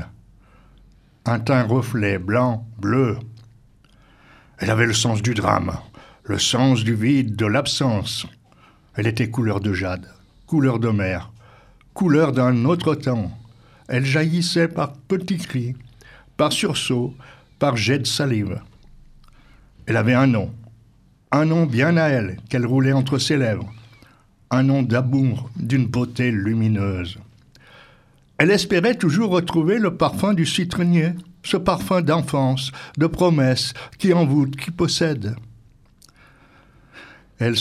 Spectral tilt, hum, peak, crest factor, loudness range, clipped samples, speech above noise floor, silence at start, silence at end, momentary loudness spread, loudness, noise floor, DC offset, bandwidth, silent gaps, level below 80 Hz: -5.5 dB/octave; none; 0 dBFS; 20 dB; 4 LU; under 0.1%; 35 dB; 0 s; 0 s; 11 LU; -20 LUFS; -54 dBFS; under 0.1%; 14.5 kHz; none; -50 dBFS